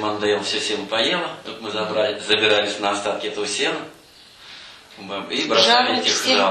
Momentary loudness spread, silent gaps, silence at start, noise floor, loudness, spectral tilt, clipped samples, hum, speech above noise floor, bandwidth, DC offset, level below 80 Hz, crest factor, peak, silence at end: 23 LU; none; 0 s; -47 dBFS; -19 LUFS; -2 dB/octave; under 0.1%; none; 26 dB; 13 kHz; under 0.1%; -64 dBFS; 18 dB; -4 dBFS; 0 s